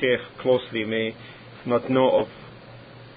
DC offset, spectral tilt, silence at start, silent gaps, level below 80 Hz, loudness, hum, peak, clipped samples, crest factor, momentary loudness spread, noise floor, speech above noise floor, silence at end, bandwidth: under 0.1%; -10 dB/octave; 0 s; none; -60 dBFS; -24 LUFS; none; -6 dBFS; under 0.1%; 18 dB; 24 LU; -44 dBFS; 21 dB; 0.1 s; 4.9 kHz